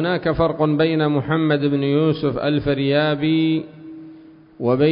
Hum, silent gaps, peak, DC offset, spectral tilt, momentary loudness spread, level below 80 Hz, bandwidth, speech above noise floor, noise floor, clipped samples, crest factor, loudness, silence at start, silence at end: none; none; -6 dBFS; under 0.1%; -12 dB/octave; 8 LU; -46 dBFS; 5.4 kHz; 26 dB; -44 dBFS; under 0.1%; 14 dB; -19 LUFS; 0 s; 0 s